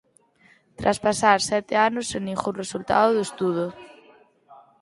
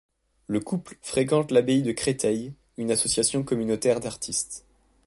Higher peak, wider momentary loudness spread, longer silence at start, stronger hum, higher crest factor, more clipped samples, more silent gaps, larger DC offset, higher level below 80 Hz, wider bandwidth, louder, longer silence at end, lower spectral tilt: first, -2 dBFS vs -8 dBFS; about the same, 9 LU vs 11 LU; first, 0.8 s vs 0.5 s; neither; about the same, 22 dB vs 18 dB; neither; neither; neither; about the same, -56 dBFS vs -56 dBFS; about the same, 11.5 kHz vs 11.5 kHz; about the same, -23 LUFS vs -25 LUFS; second, 0.25 s vs 0.45 s; about the same, -4 dB/octave vs -4 dB/octave